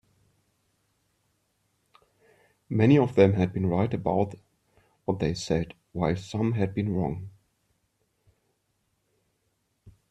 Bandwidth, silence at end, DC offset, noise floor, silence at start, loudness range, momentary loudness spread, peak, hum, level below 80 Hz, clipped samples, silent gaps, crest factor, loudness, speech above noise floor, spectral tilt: 9.6 kHz; 0.2 s; under 0.1%; -75 dBFS; 2.7 s; 8 LU; 12 LU; -6 dBFS; none; -56 dBFS; under 0.1%; none; 24 dB; -26 LUFS; 50 dB; -7.5 dB/octave